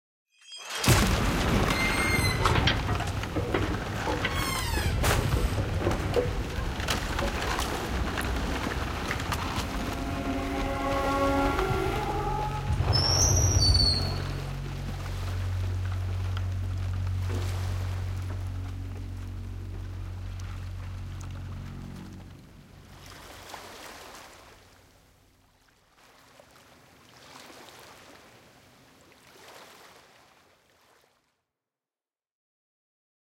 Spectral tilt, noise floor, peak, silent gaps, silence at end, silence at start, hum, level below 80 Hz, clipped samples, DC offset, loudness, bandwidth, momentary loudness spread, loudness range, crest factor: -4 dB/octave; under -90 dBFS; -8 dBFS; none; 3.25 s; 0.45 s; none; -36 dBFS; under 0.1%; under 0.1%; -28 LUFS; 16.5 kHz; 21 LU; 21 LU; 22 dB